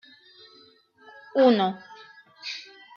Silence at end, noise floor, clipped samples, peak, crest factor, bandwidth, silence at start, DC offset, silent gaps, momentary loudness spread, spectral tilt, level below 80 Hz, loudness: 0.35 s; -56 dBFS; under 0.1%; -8 dBFS; 20 dB; 7 kHz; 1.35 s; under 0.1%; none; 25 LU; -6 dB/octave; -82 dBFS; -24 LUFS